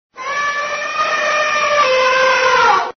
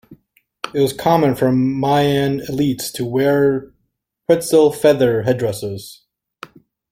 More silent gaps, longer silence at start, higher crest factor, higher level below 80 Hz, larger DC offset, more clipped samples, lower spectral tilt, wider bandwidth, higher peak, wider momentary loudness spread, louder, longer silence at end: neither; about the same, 0.15 s vs 0.1 s; about the same, 14 dB vs 16 dB; about the same, -56 dBFS vs -52 dBFS; neither; neither; second, 2 dB/octave vs -6 dB/octave; second, 6.6 kHz vs 16.5 kHz; about the same, -2 dBFS vs -2 dBFS; second, 8 LU vs 12 LU; first, -14 LUFS vs -17 LUFS; second, 0.05 s vs 1 s